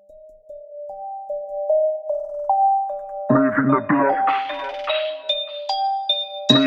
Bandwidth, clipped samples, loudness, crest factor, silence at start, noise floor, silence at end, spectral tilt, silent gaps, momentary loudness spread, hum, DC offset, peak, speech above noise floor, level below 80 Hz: 8.4 kHz; under 0.1%; -21 LUFS; 20 dB; 0.1 s; -46 dBFS; 0 s; -5.5 dB/octave; none; 15 LU; none; under 0.1%; -2 dBFS; 27 dB; -60 dBFS